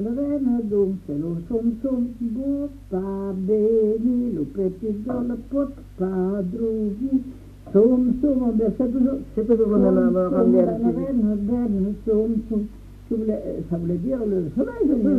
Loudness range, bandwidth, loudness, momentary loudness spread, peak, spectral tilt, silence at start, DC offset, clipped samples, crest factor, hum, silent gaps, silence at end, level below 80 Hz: 5 LU; 3.9 kHz; -22 LUFS; 10 LU; -6 dBFS; -11 dB/octave; 0 s; under 0.1%; under 0.1%; 16 dB; none; none; 0 s; -42 dBFS